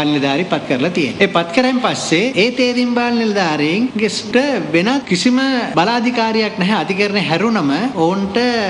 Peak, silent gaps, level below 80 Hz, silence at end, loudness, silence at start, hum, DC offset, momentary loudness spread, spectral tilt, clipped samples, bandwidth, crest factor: 0 dBFS; none; -54 dBFS; 0 s; -15 LUFS; 0 s; none; under 0.1%; 3 LU; -5 dB/octave; under 0.1%; 11 kHz; 16 dB